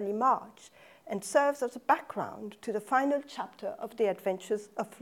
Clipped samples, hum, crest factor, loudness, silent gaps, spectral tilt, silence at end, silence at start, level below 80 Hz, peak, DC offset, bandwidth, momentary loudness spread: under 0.1%; none; 20 dB; -31 LUFS; none; -4.5 dB/octave; 0.05 s; 0 s; -80 dBFS; -10 dBFS; under 0.1%; 17 kHz; 12 LU